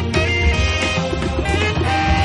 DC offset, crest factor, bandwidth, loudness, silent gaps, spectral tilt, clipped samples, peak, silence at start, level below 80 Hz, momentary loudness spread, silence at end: under 0.1%; 12 dB; 11.5 kHz; -18 LUFS; none; -5 dB/octave; under 0.1%; -4 dBFS; 0 s; -24 dBFS; 4 LU; 0 s